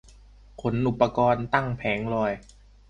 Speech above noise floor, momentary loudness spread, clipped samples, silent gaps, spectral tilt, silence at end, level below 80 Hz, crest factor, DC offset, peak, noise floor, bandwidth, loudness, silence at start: 26 dB; 7 LU; under 0.1%; none; -7.5 dB/octave; 0.5 s; -50 dBFS; 20 dB; under 0.1%; -6 dBFS; -51 dBFS; 9.4 kHz; -25 LUFS; 0.6 s